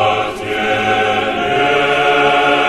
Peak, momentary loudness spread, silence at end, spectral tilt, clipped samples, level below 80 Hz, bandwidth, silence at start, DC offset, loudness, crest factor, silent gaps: 0 dBFS; 6 LU; 0 s; -4 dB/octave; under 0.1%; -44 dBFS; 13 kHz; 0 s; under 0.1%; -14 LUFS; 14 dB; none